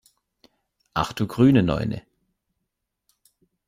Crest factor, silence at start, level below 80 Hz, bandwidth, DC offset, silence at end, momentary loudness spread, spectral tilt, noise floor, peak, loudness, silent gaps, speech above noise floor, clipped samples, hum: 20 dB; 0.95 s; -48 dBFS; 15 kHz; under 0.1%; 1.7 s; 13 LU; -7.5 dB/octave; -80 dBFS; -6 dBFS; -22 LUFS; none; 60 dB; under 0.1%; none